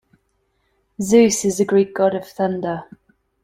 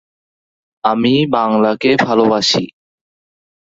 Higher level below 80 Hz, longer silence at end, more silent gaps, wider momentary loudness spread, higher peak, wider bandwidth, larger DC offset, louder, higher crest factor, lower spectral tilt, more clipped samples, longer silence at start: about the same, -58 dBFS vs -56 dBFS; second, 0.6 s vs 1.1 s; neither; first, 13 LU vs 6 LU; about the same, -2 dBFS vs 0 dBFS; first, 16 kHz vs 7.8 kHz; neither; second, -18 LUFS vs -14 LUFS; about the same, 18 dB vs 16 dB; about the same, -5 dB/octave vs -5 dB/octave; neither; first, 1 s vs 0.85 s